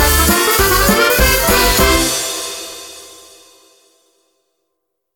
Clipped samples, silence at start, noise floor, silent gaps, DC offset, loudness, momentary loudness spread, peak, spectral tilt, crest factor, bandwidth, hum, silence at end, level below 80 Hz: under 0.1%; 0 s; -73 dBFS; none; under 0.1%; -12 LUFS; 18 LU; 0 dBFS; -2.5 dB/octave; 16 dB; 19.5 kHz; none; 2.05 s; -24 dBFS